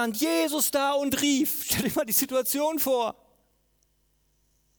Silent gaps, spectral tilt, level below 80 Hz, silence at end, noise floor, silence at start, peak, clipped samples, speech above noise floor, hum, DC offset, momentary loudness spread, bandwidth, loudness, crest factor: none; -2.5 dB/octave; -60 dBFS; 1.65 s; -69 dBFS; 0 s; -10 dBFS; under 0.1%; 43 dB; none; under 0.1%; 2 LU; over 20 kHz; -25 LUFS; 18 dB